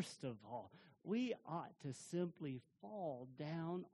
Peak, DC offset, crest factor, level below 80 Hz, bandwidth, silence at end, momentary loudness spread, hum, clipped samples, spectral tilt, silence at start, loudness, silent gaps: -32 dBFS; under 0.1%; 16 dB; -86 dBFS; 11.5 kHz; 0.05 s; 10 LU; none; under 0.1%; -6.5 dB/octave; 0 s; -47 LUFS; none